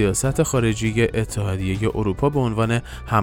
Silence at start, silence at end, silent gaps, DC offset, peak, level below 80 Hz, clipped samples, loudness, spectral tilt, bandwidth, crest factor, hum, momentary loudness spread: 0 s; 0 s; none; under 0.1%; -4 dBFS; -36 dBFS; under 0.1%; -21 LUFS; -5.5 dB/octave; 17 kHz; 16 dB; none; 4 LU